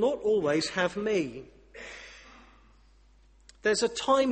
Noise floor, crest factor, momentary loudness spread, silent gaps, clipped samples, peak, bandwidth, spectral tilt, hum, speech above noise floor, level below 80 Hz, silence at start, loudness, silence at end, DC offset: -59 dBFS; 18 dB; 21 LU; none; under 0.1%; -12 dBFS; 8.8 kHz; -4 dB/octave; none; 32 dB; -60 dBFS; 0 s; -28 LUFS; 0 s; under 0.1%